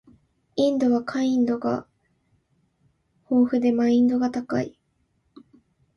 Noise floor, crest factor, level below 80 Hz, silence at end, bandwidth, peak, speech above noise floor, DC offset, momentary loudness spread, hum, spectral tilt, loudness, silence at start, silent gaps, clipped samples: -70 dBFS; 14 dB; -64 dBFS; 1.25 s; 6.8 kHz; -10 dBFS; 48 dB; under 0.1%; 9 LU; none; -6.5 dB/octave; -23 LUFS; 0.55 s; none; under 0.1%